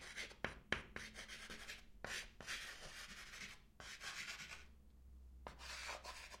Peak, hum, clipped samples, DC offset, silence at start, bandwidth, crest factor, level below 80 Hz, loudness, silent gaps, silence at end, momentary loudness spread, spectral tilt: -20 dBFS; none; under 0.1%; under 0.1%; 0 s; 16 kHz; 34 dB; -64 dBFS; -50 LUFS; none; 0 s; 13 LU; -2 dB/octave